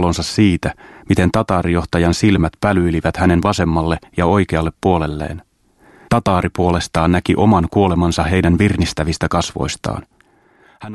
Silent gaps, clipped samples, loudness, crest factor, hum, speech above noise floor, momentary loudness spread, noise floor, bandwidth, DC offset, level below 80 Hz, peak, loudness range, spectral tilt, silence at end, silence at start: none; under 0.1%; -16 LUFS; 16 dB; none; 38 dB; 8 LU; -53 dBFS; 12.5 kHz; under 0.1%; -32 dBFS; 0 dBFS; 3 LU; -6 dB/octave; 0 s; 0 s